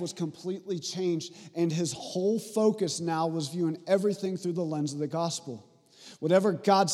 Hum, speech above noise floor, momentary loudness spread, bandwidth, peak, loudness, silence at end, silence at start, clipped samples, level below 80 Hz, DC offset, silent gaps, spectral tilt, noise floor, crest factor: none; 25 dB; 10 LU; 15 kHz; -10 dBFS; -29 LUFS; 0 s; 0 s; under 0.1%; -80 dBFS; under 0.1%; none; -5.5 dB/octave; -53 dBFS; 20 dB